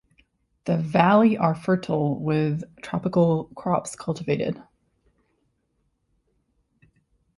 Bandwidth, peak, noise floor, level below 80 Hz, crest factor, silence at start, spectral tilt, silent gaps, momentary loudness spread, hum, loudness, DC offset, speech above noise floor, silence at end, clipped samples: 11.5 kHz; -4 dBFS; -72 dBFS; -60 dBFS; 22 dB; 0.65 s; -7.5 dB/octave; none; 13 LU; none; -23 LUFS; under 0.1%; 49 dB; 2.75 s; under 0.1%